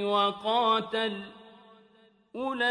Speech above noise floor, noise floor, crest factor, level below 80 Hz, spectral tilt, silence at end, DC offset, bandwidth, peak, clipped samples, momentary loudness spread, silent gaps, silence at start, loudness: 34 dB; -62 dBFS; 16 dB; -72 dBFS; -4.5 dB/octave; 0 s; under 0.1%; 10.5 kHz; -14 dBFS; under 0.1%; 17 LU; none; 0 s; -28 LUFS